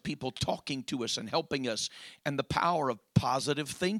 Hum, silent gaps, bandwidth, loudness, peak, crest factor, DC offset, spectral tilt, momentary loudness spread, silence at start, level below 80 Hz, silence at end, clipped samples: none; none; 16 kHz; -32 LUFS; -10 dBFS; 22 dB; under 0.1%; -4.5 dB/octave; 7 LU; 0.05 s; -58 dBFS; 0 s; under 0.1%